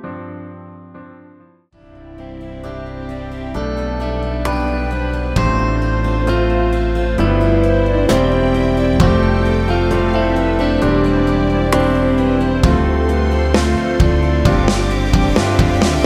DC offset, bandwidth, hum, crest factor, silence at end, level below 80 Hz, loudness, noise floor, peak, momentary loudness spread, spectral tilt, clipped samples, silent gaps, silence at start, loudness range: under 0.1%; 14 kHz; none; 16 dB; 0 s; -20 dBFS; -16 LUFS; -48 dBFS; 0 dBFS; 14 LU; -6.5 dB/octave; under 0.1%; none; 0 s; 11 LU